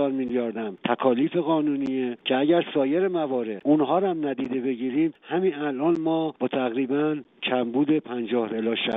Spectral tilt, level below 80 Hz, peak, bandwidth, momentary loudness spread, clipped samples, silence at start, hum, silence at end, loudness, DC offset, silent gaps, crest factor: -4.5 dB/octave; -72 dBFS; -8 dBFS; 4 kHz; 5 LU; under 0.1%; 0 s; none; 0 s; -25 LUFS; under 0.1%; none; 16 dB